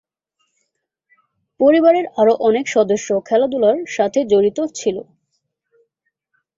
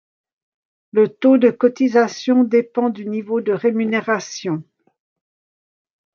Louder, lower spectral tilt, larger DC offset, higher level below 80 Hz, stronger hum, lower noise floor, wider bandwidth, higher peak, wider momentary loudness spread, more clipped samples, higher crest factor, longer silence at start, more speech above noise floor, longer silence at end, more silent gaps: about the same, -16 LUFS vs -18 LUFS; about the same, -5 dB/octave vs -6 dB/octave; neither; first, -62 dBFS vs -74 dBFS; neither; second, -74 dBFS vs under -90 dBFS; first, 7.8 kHz vs 7 kHz; about the same, -2 dBFS vs -2 dBFS; second, 8 LU vs 11 LU; neither; about the same, 16 dB vs 16 dB; first, 1.6 s vs 0.95 s; second, 58 dB vs over 73 dB; about the same, 1.55 s vs 1.5 s; neither